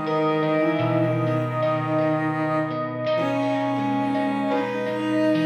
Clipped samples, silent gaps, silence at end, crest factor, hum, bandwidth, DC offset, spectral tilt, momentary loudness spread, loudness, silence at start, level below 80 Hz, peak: under 0.1%; none; 0 s; 12 dB; none; 10.5 kHz; under 0.1%; -8 dB/octave; 3 LU; -23 LUFS; 0 s; -70 dBFS; -10 dBFS